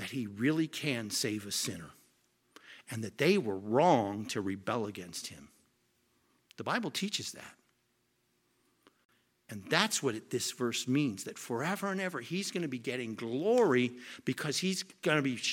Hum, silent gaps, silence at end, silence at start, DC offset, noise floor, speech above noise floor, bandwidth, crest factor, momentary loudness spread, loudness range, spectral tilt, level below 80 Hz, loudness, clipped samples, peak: none; 9.05-9.09 s; 0 s; 0 s; under 0.1%; -76 dBFS; 43 dB; 17 kHz; 24 dB; 14 LU; 8 LU; -4 dB/octave; -78 dBFS; -33 LUFS; under 0.1%; -10 dBFS